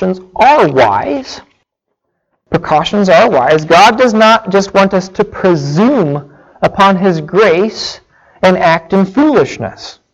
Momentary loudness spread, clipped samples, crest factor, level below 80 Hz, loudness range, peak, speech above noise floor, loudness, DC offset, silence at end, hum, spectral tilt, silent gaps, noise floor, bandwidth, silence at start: 12 LU; under 0.1%; 10 dB; -44 dBFS; 3 LU; 0 dBFS; 61 dB; -10 LUFS; under 0.1%; 0.25 s; none; -5.5 dB/octave; none; -70 dBFS; 12 kHz; 0 s